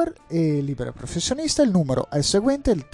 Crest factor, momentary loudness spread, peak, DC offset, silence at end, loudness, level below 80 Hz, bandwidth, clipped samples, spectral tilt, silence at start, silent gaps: 16 dB; 8 LU; -6 dBFS; under 0.1%; 0.1 s; -22 LUFS; -42 dBFS; 11.5 kHz; under 0.1%; -5 dB/octave; 0 s; none